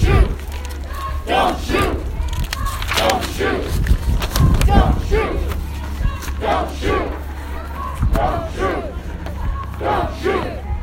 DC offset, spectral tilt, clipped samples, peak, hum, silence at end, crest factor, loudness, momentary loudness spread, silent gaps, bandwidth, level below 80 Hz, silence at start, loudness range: under 0.1%; -5.5 dB/octave; under 0.1%; 0 dBFS; none; 0 s; 18 dB; -20 LUFS; 11 LU; none; 17 kHz; -22 dBFS; 0 s; 4 LU